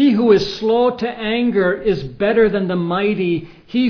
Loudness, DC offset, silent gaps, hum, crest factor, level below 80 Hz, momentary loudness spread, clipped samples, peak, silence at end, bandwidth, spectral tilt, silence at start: -17 LUFS; under 0.1%; none; none; 16 dB; -44 dBFS; 7 LU; under 0.1%; 0 dBFS; 0 s; 5.4 kHz; -7 dB/octave; 0 s